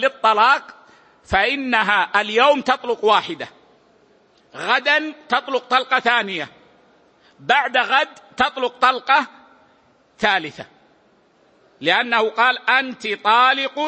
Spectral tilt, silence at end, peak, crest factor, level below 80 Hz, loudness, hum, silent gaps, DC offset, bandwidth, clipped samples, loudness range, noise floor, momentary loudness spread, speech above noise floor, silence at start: -3 dB/octave; 0 s; -2 dBFS; 18 dB; -54 dBFS; -18 LUFS; none; none; under 0.1%; 8.8 kHz; under 0.1%; 3 LU; -57 dBFS; 11 LU; 38 dB; 0 s